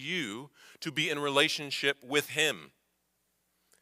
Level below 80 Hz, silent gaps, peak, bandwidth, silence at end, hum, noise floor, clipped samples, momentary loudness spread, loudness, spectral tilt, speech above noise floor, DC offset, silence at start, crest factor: -80 dBFS; none; -10 dBFS; 16 kHz; 1.15 s; none; -77 dBFS; under 0.1%; 14 LU; -29 LUFS; -2.5 dB/octave; 46 dB; under 0.1%; 0 s; 22 dB